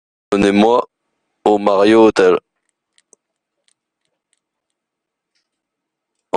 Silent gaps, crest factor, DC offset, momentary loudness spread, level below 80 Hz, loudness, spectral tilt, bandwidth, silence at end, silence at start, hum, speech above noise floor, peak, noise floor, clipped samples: none; 16 dB; under 0.1%; 10 LU; -52 dBFS; -13 LUFS; -6 dB/octave; 10 kHz; 0 s; 0.3 s; none; 68 dB; 0 dBFS; -80 dBFS; under 0.1%